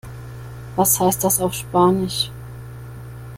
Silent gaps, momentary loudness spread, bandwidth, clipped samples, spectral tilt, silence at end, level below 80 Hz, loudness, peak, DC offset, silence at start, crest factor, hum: none; 20 LU; 16.5 kHz; under 0.1%; -4 dB/octave; 0 s; -44 dBFS; -18 LUFS; -4 dBFS; under 0.1%; 0.05 s; 18 dB; none